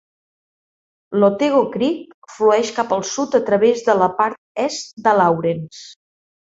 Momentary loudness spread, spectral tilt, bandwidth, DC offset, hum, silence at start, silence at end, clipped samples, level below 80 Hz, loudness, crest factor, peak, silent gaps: 9 LU; -5 dB/octave; 8 kHz; under 0.1%; none; 1.1 s; 0.65 s; under 0.1%; -64 dBFS; -18 LUFS; 18 dB; -2 dBFS; 2.14-2.22 s, 4.38-4.55 s, 4.93-4.97 s